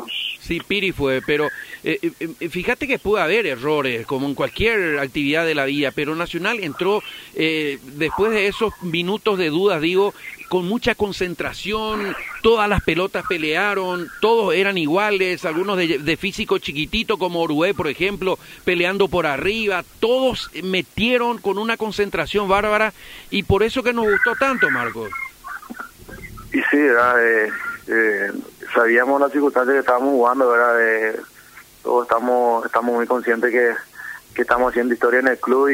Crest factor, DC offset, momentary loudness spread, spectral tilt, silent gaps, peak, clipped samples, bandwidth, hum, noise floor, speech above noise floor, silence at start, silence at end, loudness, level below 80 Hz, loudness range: 16 dB; under 0.1%; 9 LU; -5 dB/octave; none; -4 dBFS; under 0.1%; 16 kHz; none; -45 dBFS; 26 dB; 0 s; 0 s; -19 LUFS; -44 dBFS; 4 LU